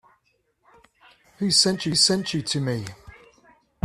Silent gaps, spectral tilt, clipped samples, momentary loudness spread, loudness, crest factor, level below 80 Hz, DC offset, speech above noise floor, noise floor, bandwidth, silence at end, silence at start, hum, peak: none; -3 dB/octave; under 0.1%; 12 LU; -21 LUFS; 20 dB; -58 dBFS; under 0.1%; 46 dB; -69 dBFS; 14.5 kHz; 0.75 s; 1.4 s; none; -6 dBFS